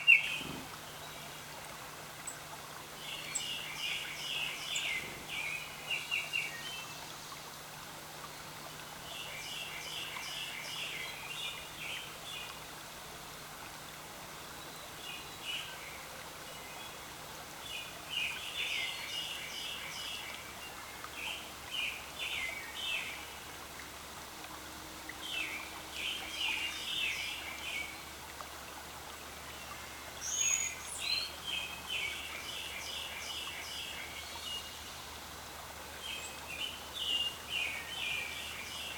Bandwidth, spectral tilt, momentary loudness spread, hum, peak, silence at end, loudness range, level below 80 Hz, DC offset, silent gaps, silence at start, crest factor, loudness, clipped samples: 19.5 kHz; -0.5 dB/octave; 11 LU; none; -10 dBFS; 0 s; 7 LU; -62 dBFS; under 0.1%; none; 0 s; 30 dB; -38 LUFS; under 0.1%